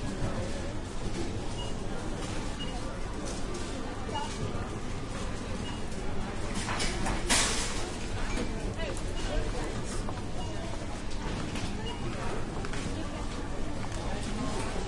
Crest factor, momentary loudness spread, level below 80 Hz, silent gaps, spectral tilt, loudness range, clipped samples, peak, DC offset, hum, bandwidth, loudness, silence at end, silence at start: 20 dB; 6 LU; -38 dBFS; none; -4 dB/octave; 5 LU; under 0.1%; -12 dBFS; under 0.1%; none; 11.5 kHz; -35 LUFS; 0 s; 0 s